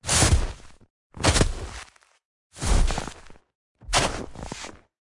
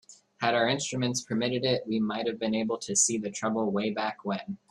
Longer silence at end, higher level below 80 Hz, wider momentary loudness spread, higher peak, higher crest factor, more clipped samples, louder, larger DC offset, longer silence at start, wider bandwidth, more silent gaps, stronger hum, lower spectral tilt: first, 0.35 s vs 0.15 s; first, -30 dBFS vs -70 dBFS; first, 18 LU vs 7 LU; about the same, -6 dBFS vs -8 dBFS; about the same, 20 dB vs 20 dB; neither; first, -24 LUFS vs -28 LUFS; neither; about the same, 0.05 s vs 0.1 s; about the same, 11.5 kHz vs 12.5 kHz; first, 0.90-1.10 s, 2.25-2.50 s, 3.55-3.75 s vs none; neither; about the same, -3 dB/octave vs -3.5 dB/octave